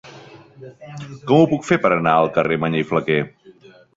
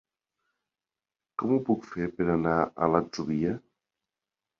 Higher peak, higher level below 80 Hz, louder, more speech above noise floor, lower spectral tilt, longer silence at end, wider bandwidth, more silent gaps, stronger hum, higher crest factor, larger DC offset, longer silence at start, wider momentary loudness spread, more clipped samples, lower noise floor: first, -2 dBFS vs -8 dBFS; about the same, -56 dBFS vs -58 dBFS; first, -18 LUFS vs -28 LUFS; second, 29 dB vs over 63 dB; about the same, -7 dB/octave vs -7.5 dB/octave; second, 0.7 s vs 1 s; first, 8 kHz vs 7.2 kHz; neither; neither; second, 18 dB vs 24 dB; neither; second, 0.05 s vs 1.4 s; first, 18 LU vs 9 LU; neither; second, -47 dBFS vs under -90 dBFS